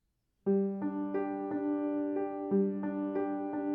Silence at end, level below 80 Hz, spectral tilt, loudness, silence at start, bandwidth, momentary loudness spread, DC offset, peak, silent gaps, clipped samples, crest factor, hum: 0 s; -78 dBFS; -12 dB/octave; -34 LUFS; 0.45 s; 3.2 kHz; 4 LU; under 0.1%; -20 dBFS; none; under 0.1%; 14 dB; none